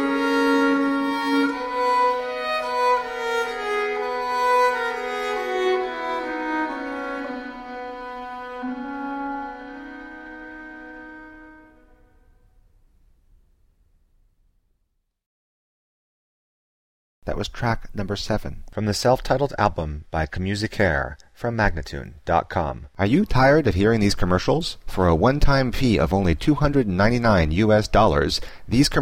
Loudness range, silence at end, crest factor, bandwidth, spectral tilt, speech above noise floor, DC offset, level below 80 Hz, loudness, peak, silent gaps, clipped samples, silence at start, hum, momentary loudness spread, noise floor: 14 LU; 0 s; 18 dB; 16 kHz; -6 dB/octave; 52 dB; under 0.1%; -34 dBFS; -22 LUFS; -4 dBFS; 15.26-17.22 s; under 0.1%; 0 s; none; 15 LU; -72 dBFS